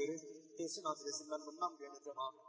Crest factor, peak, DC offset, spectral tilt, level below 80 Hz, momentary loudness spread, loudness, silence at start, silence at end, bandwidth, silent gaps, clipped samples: 20 dB; -26 dBFS; under 0.1%; -2.5 dB/octave; under -90 dBFS; 8 LU; -45 LUFS; 0 s; 0 s; 8 kHz; none; under 0.1%